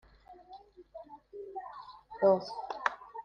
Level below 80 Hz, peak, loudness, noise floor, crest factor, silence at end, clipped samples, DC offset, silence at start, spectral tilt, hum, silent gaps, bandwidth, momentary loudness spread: -70 dBFS; -10 dBFS; -33 LUFS; -56 dBFS; 26 dB; 0 s; under 0.1%; under 0.1%; 0.3 s; -6 dB/octave; none; none; 7.2 kHz; 25 LU